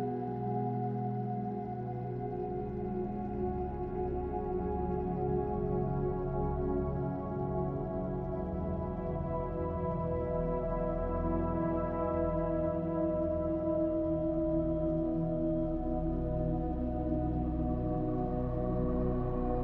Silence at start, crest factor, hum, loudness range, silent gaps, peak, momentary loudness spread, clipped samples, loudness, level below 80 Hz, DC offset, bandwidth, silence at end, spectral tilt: 0 s; 14 dB; none; 4 LU; none; -20 dBFS; 4 LU; under 0.1%; -34 LUFS; -42 dBFS; under 0.1%; 4.2 kHz; 0 s; -12.5 dB/octave